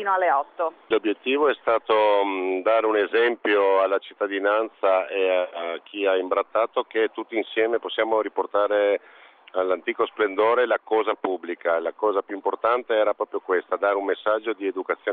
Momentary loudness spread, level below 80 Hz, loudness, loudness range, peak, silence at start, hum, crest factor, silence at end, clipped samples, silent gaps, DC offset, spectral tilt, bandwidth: 7 LU; -74 dBFS; -23 LUFS; 3 LU; -8 dBFS; 0 s; none; 16 dB; 0 s; under 0.1%; none; under 0.1%; 0 dB/octave; 4.5 kHz